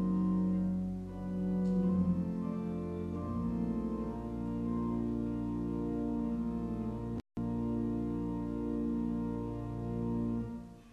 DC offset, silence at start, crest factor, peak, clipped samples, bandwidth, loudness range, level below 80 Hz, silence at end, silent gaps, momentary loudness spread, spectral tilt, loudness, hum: under 0.1%; 0 s; 14 dB; -20 dBFS; under 0.1%; 5.8 kHz; 2 LU; -48 dBFS; 0 s; none; 7 LU; -10.5 dB/octave; -36 LUFS; none